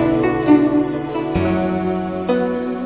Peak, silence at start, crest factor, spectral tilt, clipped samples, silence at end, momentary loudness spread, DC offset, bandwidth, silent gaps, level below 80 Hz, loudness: -2 dBFS; 0 s; 16 dB; -12 dB/octave; under 0.1%; 0 s; 8 LU; 0.3%; 4 kHz; none; -40 dBFS; -18 LUFS